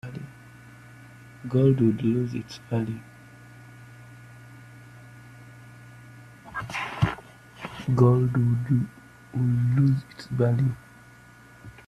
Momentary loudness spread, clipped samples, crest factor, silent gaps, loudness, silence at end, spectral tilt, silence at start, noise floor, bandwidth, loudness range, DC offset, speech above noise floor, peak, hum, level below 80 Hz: 26 LU; under 0.1%; 20 dB; none; -25 LUFS; 0.15 s; -8.5 dB/octave; 0.05 s; -50 dBFS; 11 kHz; 18 LU; under 0.1%; 28 dB; -6 dBFS; none; -56 dBFS